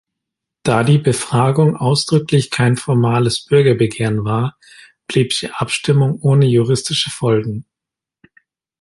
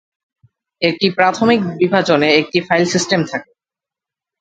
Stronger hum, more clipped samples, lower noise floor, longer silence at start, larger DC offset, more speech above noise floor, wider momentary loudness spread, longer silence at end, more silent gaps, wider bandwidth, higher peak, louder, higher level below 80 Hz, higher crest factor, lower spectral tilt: neither; neither; about the same, -86 dBFS vs -88 dBFS; second, 0.65 s vs 0.8 s; neither; about the same, 71 dB vs 73 dB; about the same, 6 LU vs 6 LU; first, 1.2 s vs 1 s; neither; first, 11.5 kHz vs 9.2 kHz; about the same, 0 dBFS vs 0 dBFS; about the same, -16 LUFS vs -15 LUFS; first, -50 dBFS vs -56 dBFS; about the same, 16 dB vs 16 dB; first, -6 dB/octave vs -4.5 dB/octave